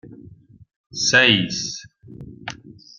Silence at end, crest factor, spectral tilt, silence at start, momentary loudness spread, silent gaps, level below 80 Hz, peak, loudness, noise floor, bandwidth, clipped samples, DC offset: 0.45 s; 22 dB; -2.5 dB/octave; 0.05 s; 23 LU; 0.76-0.90 s; -56 dBFS; -2 dBFS; -17 LUFS; -46 dBFS; 11 kHz; under 0.1%; under 0.1%